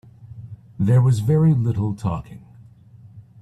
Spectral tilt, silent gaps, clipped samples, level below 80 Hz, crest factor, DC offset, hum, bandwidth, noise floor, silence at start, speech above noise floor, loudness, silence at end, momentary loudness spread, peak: -9 dB/octave; none; under 0.1%; -50 dBFS; 14 dB; under 0.1%; none; 11 kHz; -47 dBFS; 0.25 s; 29 dB; -19 LUFS; 0.2 s; 24 LU; -6 dBFS